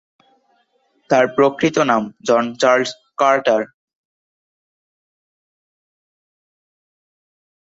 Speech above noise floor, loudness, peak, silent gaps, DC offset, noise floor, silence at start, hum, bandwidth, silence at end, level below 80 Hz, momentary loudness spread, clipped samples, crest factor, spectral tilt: 47 dB; -17 LUFS; -2 dBFS; none; under 0.1%; -63 dBFS; 1.1 s; none; 8 kHz; 4 s; -64 dBFS; 5 LU; under 0.1%; 18 dB; -4.5 dB/octave